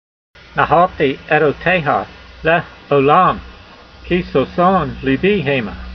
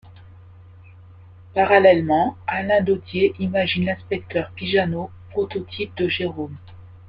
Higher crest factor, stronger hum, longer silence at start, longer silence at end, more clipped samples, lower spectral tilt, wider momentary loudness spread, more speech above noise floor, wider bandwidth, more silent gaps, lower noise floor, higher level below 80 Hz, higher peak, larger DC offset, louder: about the same, 16 dB vs 20 dB; neither; first, 0.55 s vs 0.05 s; about the same, 0 s vs 0.1 s; neither; about the same, -8 dB/octave vs -9 dB/octave; second, 8 LU vs 14 LU; about the same, 25 dB vs 24 dB; first, 6.2 kHz vs 5.4 kHz; neither; second, -40 dBFS vs -45 dBFS; first, -38 dBFS vs -54 dBFS; about the same, 0 dBFS vs -2 dBFS; neither; first, -15 LUFS vs -21 LUFS